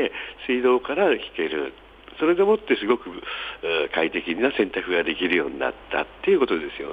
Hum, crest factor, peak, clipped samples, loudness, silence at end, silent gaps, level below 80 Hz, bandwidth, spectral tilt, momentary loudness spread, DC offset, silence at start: none; 18 dB; -6 dBFS; under 0.1%; -23 LUFS; 0 s; none; -54 dBFS; 4.9 kHz; -6.5 dB/octave; 9 LU; under 0.1%; 0 s